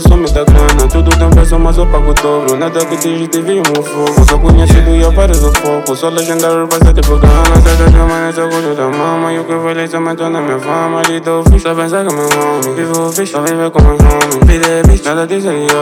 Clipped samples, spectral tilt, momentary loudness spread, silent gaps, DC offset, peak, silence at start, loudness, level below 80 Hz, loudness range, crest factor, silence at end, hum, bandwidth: 2%; -5.5 dB/octave; 7 LU; none; under 0.1%; 0 dBFS; 0 s; -10 LUFS; -10 dBFS; 4 LU; 8 dB; 0 s; none; 16 kHz